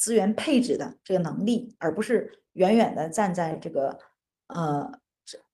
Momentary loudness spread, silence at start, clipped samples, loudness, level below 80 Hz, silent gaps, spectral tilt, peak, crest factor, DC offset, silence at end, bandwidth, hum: 11 LU; 0 s; under 0.1%; -26 LUFS; -68 dBFS; none; -5 dB/octave; -8 dBFS; 18 dB; under 0.1%; 0.15 s; 12.5 kHz; none